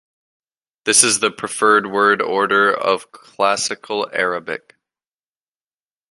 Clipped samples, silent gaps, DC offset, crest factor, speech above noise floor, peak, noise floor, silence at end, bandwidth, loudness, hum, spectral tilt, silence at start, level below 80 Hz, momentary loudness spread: under 0.1%; none; under 0.1%; 20 dB; over 72 dB; 0 dBFS; under -90 dBFS; 1.55 s; 15 kHz; -16 LUFS; none; -1 dB/octave; 0.85 s; -66 dBFS; 11 LU